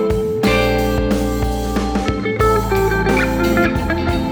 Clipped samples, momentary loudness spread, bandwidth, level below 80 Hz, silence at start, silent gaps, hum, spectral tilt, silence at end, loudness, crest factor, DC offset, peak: under 0.1%; 4 LU; over 20 kHz; -24 dBFS; 0 s; none; none; -6 dB/octave; 0 s; -17 LUFS; 14 dB; under 0.1%; -2 dBFS